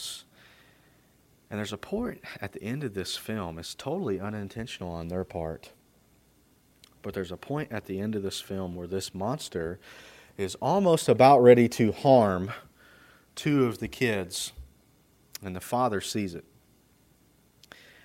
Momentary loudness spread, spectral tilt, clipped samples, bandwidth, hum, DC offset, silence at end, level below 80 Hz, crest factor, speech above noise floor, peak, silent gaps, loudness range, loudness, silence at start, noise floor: 19 LU; -5.5 dB/octave; under 0.1%; 16 kHz; none; under 0.1%; 1.65 s; -58 dBFS; 24 dB; 36 dB; -6 dBFS; none; 14 LU; -27 LUFS; 0 s; -63 dBFS